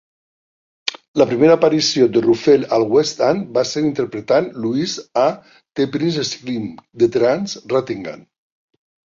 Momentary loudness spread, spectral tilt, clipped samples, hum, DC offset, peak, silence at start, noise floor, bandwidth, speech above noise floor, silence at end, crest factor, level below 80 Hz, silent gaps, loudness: 12 LU; -5 dB/octave; under 0.1%; none; under 0.1%; 0 dBFS; 0.85 s; under -90 dBFS; 7.6 kHz; over 73 dB; 0.9 s; 16 dB; -60 dBFS; 1.08-1.14 s; -17 LUFS